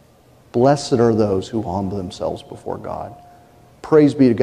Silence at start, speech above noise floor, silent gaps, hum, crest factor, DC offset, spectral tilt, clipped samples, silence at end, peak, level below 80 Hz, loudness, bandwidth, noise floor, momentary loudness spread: 0.55 s; 33 dB; none; none; 16 dB; under 0.1%; -7 dB/octave; under 0.1%; 0 s; -2 dBFS; -50 dBFS; -18 LUFS; 11 kHz; -50 dBFS; 16 LU